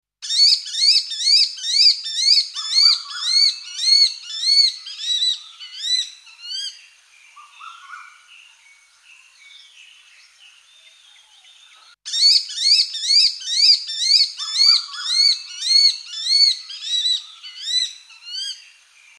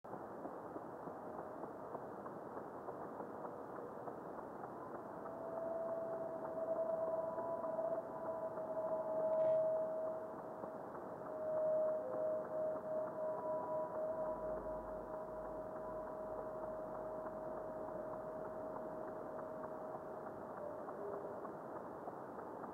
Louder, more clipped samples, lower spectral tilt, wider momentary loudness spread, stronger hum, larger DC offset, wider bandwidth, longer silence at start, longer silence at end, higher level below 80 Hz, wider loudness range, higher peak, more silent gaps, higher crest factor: first, -15 LUFS vs -44 LUFS; neither; second, 10 dB/octave vs -8.5 dB/octave; first, 15 LU vs 10 LU; neither; neither; first, 13.5 kHz vs 5.4 kHz; first, 0.2 s vs 0.05 s; first, 0.6 s vs 0 s; second, -88 dBFS vs -72 dBFS; first, 12 LU vs 9 LU; first, -2 dBFS vs -28 dBFS; neither; about the same, 18 dB vs 16 dB